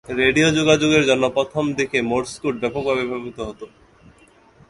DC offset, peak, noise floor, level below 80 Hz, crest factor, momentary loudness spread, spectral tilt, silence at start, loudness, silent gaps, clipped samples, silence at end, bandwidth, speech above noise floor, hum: under 0.1%; -2 dBFS; -52 dBFS; -48 dBFS; 18 dB; 14 LU; -4.5 dB/octave; 0.1 s; -19 LUFS; none; under 0.1%; 1 s; 11.5 kHz; 33 dB; none